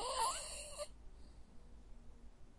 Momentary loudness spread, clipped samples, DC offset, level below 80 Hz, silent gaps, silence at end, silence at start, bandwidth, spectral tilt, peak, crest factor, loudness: 25 LU; under 0.1%; under 0.1%; -58 dBFS; none; 0 s; 0 s; 11.5 kHz; -1 dB/octave; -26 dBFS; 20 dB; -42 LUFS